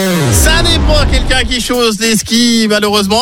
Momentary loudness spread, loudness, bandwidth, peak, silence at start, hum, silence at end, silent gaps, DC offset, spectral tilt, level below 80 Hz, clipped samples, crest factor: 3 LU; -10 LUFS; 17 kHz; 0 dBFS; 0 s; none; 0 s; none; under 0.1%; -3.5 dB/octave; -16 dBFS; under 0.1%; 10 dB